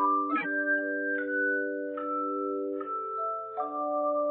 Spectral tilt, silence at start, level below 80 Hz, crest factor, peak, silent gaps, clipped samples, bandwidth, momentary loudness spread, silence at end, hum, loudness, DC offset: -2.5 dB/octave; 0 s; -88 dBFS; 14 dB; -16 dBFS; none; under 0.1%; 4.2 kHz; 6 LU; 0 s; 60 Hz at -75 dBFS; -30 LUFS; under 0.1%